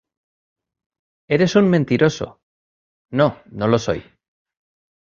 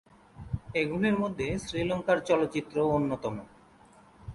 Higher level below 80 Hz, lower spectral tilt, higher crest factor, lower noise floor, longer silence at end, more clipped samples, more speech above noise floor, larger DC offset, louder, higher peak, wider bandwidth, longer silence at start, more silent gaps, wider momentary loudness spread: about the same, -52 dBFS vs -52 dBFS; about the same, -6.5 dB/octave vs -6.5 dB/octave; about the same, 20 dB vs 18 dB; first, under -90 dBFS vs -57 dBFS; first, 1.1 s vs 0 s; neither; first, over 73 dB vs 28 dB; neither; first, -19 LUFS vs -29 LUFS; first, -2 dBFS vs -12 dBFS; second, 7.6 kHz vs 11.5 kHz; first, 1.3 s vs 0.35 s; first, 2.43-3.05 s vs none; about the same, 12 LU vs 12 LU